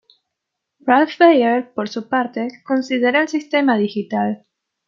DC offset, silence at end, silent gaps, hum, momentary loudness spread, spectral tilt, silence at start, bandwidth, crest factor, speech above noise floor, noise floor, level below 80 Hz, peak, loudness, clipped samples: under 0.1%; 0.5 s; none; none; 13 LU; -5.5 dB/octave; 0.85 s; 7.4 kHz; 16 dB; 63 dB; -80 dBFS; -70 dBFS; -2 dBFS; -18 LUFS; under 0.1%